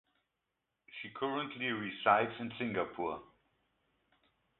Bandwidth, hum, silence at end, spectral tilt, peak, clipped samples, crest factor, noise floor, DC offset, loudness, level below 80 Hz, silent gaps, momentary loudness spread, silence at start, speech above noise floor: 4.2 kHz; none; 1.35 s; -2.5 dB/octave; -14 dBFS; under 0.1%; 26 dB; -86 dBFS; under 0.1%; -35 LUFS; -74 dBFS; none; 17 LU; 0.9 s; 51 dB